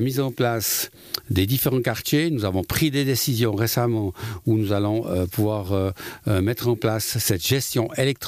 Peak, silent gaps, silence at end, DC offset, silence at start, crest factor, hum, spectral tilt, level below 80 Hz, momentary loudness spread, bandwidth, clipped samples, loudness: -8 dBFS; none; 0 s; under 0.1%; 0 s; 16 dB; none; -5 dB/octave; -50 dBFS; 4 LU; 15.5 kHz; under 0.1%; -23 LUFS